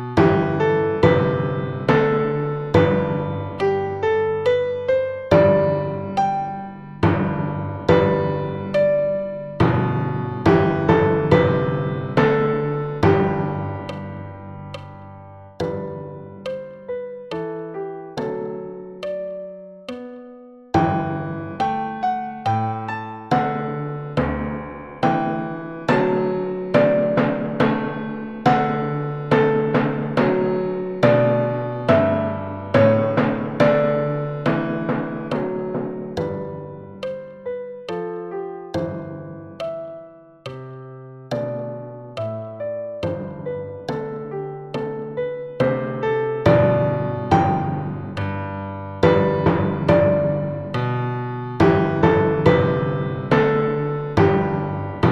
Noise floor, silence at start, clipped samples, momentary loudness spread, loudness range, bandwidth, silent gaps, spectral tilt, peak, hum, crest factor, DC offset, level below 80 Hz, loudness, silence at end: -42 dBFS; 0 s; under 0.1%; 15 LU; 11 LU; 8 kHz; none; -8.5 dB/octave; -2 dBFS; none; 20 dB; 0.2%; -46 dBFS; -21 LUFS; 0 s